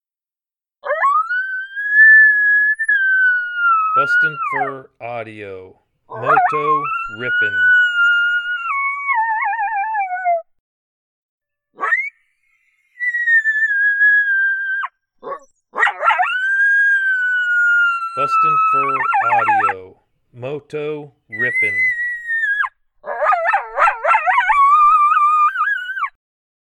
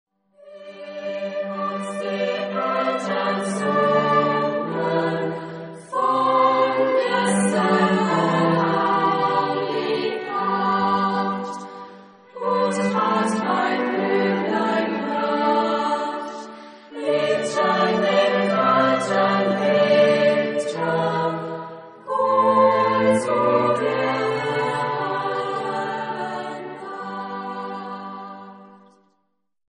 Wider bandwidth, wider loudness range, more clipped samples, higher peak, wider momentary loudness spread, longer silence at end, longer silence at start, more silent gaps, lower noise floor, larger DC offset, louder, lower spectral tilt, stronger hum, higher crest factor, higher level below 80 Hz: about the same, 11 kHz vs 10 kHz; about the same, 8 LU vs 7 LU; neither; first, -2 dBFS vs -6 dBFS; about the same, 16 LU vs 14 LU; second, 0.65 s vs 1 s; first, 0.85 s vs 0.45 s; first, 10.60-11.38 s vs none; first, under -90 dBFS vs -73 dBFS; neither; first, -15 LUFS vs -21 LUFS; second, -3.5 dB/octave vs -5.5 dB/octave; neither; about the same, 16 dB vs 16 dB; first, -60 dBFS vs -66 dBFS